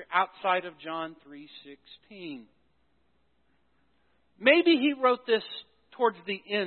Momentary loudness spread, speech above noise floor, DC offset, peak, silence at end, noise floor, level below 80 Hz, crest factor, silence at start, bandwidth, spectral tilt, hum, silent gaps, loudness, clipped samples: 25 LU; 44 dB; under 0.1%; -6 dBFS; 0 s; -72 dBFS; -78 dBFS; 24 dB; 0 s; 4.4 kHz; -8 dB/octave; none; none; -26 LUFS; under 0.1%